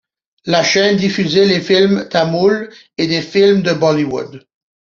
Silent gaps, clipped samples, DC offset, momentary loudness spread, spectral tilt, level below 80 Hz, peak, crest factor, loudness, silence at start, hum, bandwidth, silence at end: none; under 0.1%; under 0.1%; 9 LU; -5 dB/octave; -54 dBFS; 0 dBFS; 14 dB; -14 LUFS; 0.45 s; none; 7.2 kHz; 0.55 s